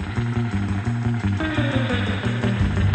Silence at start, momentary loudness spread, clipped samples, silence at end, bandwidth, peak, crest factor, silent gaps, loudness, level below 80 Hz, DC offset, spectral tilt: 0 s; 3 LU; under 0.1%; 0 s; 8.8 kHz; -8 dBFS; 14 dB; none; -23 LUFS; -34 dBFS; under 0.1%; -7 dB/octave